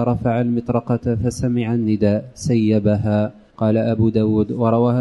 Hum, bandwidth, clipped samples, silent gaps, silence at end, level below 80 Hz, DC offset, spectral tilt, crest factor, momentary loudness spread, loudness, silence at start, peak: none; 11.5 kHz; under 0.1%; none; 0 s; -44 dBFS; under 0.1%; -8 dB/octave; 14 dB; 4 LU; -19 LUFS; 0 s; -4 dBFS